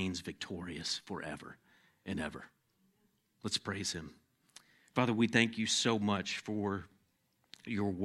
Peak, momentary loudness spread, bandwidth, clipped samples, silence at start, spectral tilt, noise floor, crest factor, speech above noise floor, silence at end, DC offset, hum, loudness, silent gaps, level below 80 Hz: -12 dBFS; 16 LU; 13 kHz; under 0.1%; 0 s; -4 dB/octave; -76 dBFS; 26 dB; 41 dB; 0 s; under 0.1%; none; -35 LUFS; none; -68 dBFS